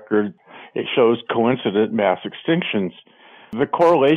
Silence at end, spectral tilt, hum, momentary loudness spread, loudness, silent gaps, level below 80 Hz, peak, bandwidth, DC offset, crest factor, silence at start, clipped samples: 0 s; -7.5 dB/octave; none; 12 LU; -20 LUFS; none; -64 dBFS; -4 dBFS; 7 kHz; under 0.1%; 14 dB; 0 s; under 0.1%